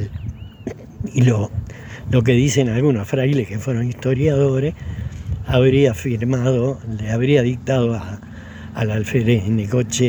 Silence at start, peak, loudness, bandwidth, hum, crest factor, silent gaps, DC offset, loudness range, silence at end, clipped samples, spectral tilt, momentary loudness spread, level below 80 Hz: 0 s; -2 dBFS; -19 LUFS; over 20 kHz; none; 16 dB; none; under 0.1%; 2 LU; 0 s; under 0.1%; -6.5 dB/octave; 17 LU; -38 dBFS